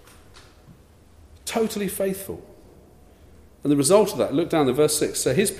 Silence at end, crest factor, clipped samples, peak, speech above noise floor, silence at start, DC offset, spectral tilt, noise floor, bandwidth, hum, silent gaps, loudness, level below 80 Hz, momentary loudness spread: 0 s; 20 dB; under 0.1%; -4 dBFS; 30 dB; 0.35 s; under 0.1%; -4.5 dB/octave; -51 dBFS; 15.5 kHz; none; none; -22 LUFS; -54 dBFS; 15 LU